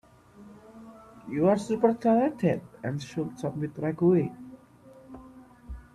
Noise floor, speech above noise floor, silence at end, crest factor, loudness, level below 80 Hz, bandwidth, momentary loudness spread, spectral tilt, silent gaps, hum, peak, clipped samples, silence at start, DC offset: -53 dBFS; 27 dB; 0.15 s; 20 dB; -27 LUFS; -56 dBFS; 12.5 kHz; 24 LU; -8 dB/octave; none; none; -10 dBFS; under 0.1%; 0.4 s; under 0.1%